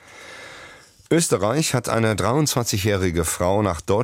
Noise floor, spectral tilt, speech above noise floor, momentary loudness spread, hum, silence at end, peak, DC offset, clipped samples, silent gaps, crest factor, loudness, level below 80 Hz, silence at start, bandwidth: -45 dBFS; -4.5 dB/octave; 25 dB; 19 LU; none; 0 s; -6 dBFS; under 0.1%; under 0.1%; none; 16 dB; -21 LUFS; -44 dBFS; 0.1 s; 16.5 kHz